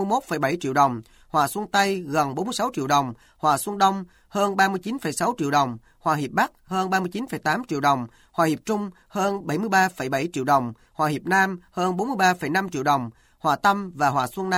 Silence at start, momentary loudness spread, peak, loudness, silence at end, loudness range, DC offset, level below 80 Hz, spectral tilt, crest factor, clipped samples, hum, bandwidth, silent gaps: 0 s; 7 LU; -6 dBFS; -23 LUFS; 0 s; 2 LU; under 0.1%; -60 dBFS; -4.5 dB/octave; 18 dB; under 0.1%; none; 17 kHz; none